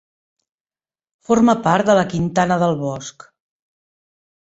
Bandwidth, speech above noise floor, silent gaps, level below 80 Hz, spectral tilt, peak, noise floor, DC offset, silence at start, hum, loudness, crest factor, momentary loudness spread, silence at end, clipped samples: 8 kHz; over 73 dB; none; -54 dBFS; -6 dB/octave; -2 dBFS; under -90 dBFS; under 0.1%; 1.3 s; none; -17 LUFS; 18 dB; 12 LU; 1.4 s; under 0.1%